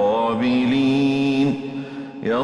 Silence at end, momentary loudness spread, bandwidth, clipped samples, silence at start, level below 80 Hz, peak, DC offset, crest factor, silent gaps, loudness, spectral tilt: 0 s; 12 LU; 10 kHz; under 0.1%; 0 s; -56 dBFS; -10 dBFS; under 0.1%; 10 dB; none; -20 LUFS; -7 dB/octave